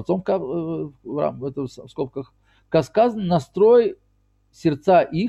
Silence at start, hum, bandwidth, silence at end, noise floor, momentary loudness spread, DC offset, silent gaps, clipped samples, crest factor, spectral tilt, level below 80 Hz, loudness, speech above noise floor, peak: 0 s; 50 Hz at -55 dBFS; 8.4 kHz; 0 s; -63 dBFS; 15 LU; under 0.1%; none; under 0.1%; 16 dB; -8 dB/octave; -54 dBFS; -21 LUFS; 42 dB; -6 dBFS